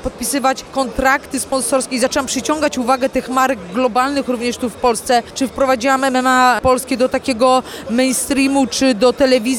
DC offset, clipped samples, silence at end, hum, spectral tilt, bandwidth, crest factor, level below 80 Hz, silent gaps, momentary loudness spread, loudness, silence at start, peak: under 0.1%; under 0.1%; 0 s; none; -3 dB/octave; 18 kHz; 14 dB; -42 dBFS; none; 6 LU; -16 LUFS; 0 s; -2 dBFS